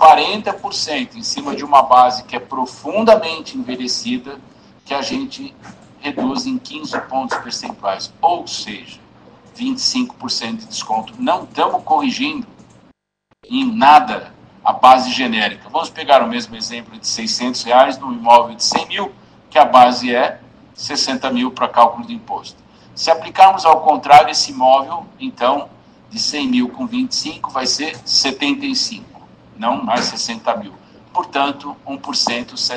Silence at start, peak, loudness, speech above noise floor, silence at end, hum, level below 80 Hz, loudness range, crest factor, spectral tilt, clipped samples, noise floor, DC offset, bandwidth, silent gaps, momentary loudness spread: 0 s; 0 dBFS; -16 LUFS; 47 dB; 0 s; none; -56 dBFS; 9 LU; 16 dB; -2.5 dB/octave; 0.2%; -63 dBFS; under 0.1%; 11 kHz; none; 16 LU